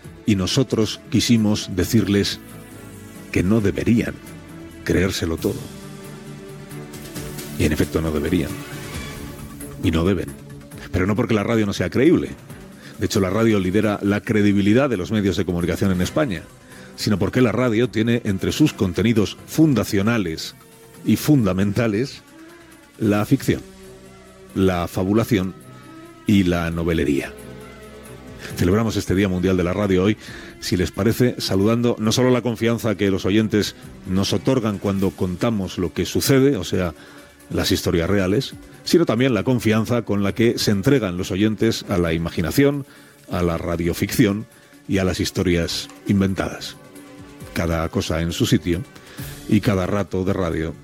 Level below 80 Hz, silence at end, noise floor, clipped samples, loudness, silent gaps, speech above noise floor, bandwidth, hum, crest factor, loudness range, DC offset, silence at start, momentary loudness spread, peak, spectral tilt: -44 dBFS; 0 s; -45 dBFS; under 0.1%; -20 LUFS; none; 26 dB; 17 kHz; none; 18 dB; 5 LU; under 0.1%; 0.05 s; 19 LU; -2 dBFS; -6 dB/octave